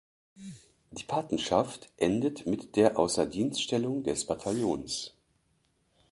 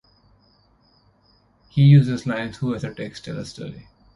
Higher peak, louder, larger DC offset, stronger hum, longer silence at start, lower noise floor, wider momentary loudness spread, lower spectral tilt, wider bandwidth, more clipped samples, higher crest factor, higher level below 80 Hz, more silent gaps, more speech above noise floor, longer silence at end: second, -10 dBFS vs -2 dBFS; second, -30 LUFS vs -20 LUFS; neither; second, none vs 50 Hz at -50 dBFS; second, 0.4 s vs 1.75 s; first, -72 dBFS vs -60 dBFS; about the same, 18 LU vs 20 LU; second, -4.5 dB/octave vs -8 dB/octave; about the same, 11.5 kHz vs 10.5 kHz; neither; about the same, 22 dB vs 20 dB; second, -60 dBFS vs -52 dBFS; neither; about the same, 43 dB vs 40 dB; first, 1.05 s vs 0.35 s